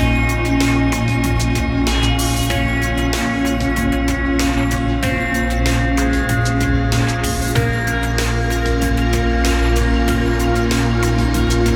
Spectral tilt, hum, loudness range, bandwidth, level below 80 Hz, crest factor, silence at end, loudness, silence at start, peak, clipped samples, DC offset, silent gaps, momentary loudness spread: -5 dB/octave; none; 1 LU; 17.5 kHz; -20 dBFS; 14 dB; 0 s; -17 LUFS; 0 s; -2 dBFS; under 0.1%; under 0.1%; none; 2 LU